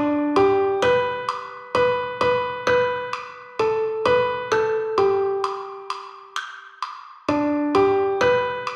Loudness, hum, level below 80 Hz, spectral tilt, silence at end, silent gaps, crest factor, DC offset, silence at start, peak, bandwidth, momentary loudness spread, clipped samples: -21 LUFS; none; -56 dBFS; -5 dB/octave; 0 s; none; 16 dB; under 0.1%; 0 s; -6 dBFS; 9.6 kHz; 13 LU; under 0.1%